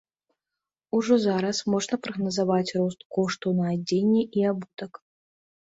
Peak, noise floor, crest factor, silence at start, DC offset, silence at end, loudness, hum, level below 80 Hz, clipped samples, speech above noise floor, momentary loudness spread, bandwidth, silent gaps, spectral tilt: -10 dBFS; -88 dBFS; 16 dB; 0.95 s; under 0.1%; 0.85 s; -25 LUFS; none; -68 dBFS; under 0.1%; 64 dB; 7 LU; 8 kHz; 3.05-3.10 s; -6 dB/octave